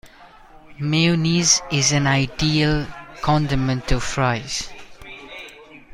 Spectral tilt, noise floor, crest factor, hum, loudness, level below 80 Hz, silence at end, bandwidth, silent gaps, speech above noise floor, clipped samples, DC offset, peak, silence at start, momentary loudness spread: -4 dB/octave; -46 dBFS; 18 dB; none; -19 LUFS; -34 dBFS; 0 s; 12.5 kHz; none; 27 dB; under 0.1%; under 0.1%; -4 dBFS; 0.05 s; 20 LU